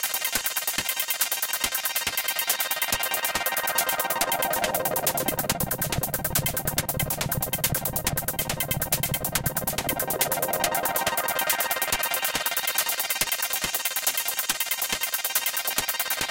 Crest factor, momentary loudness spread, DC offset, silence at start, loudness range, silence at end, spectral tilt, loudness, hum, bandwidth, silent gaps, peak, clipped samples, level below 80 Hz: 20 dB; 2 LU; under 0.1%; 0 s; 1 LU; 0 s; -1.5 dB/octave; -24 LUFS; none; 17.5 kHz; none; -6 dBFS; under 0.1%; -46 dBFS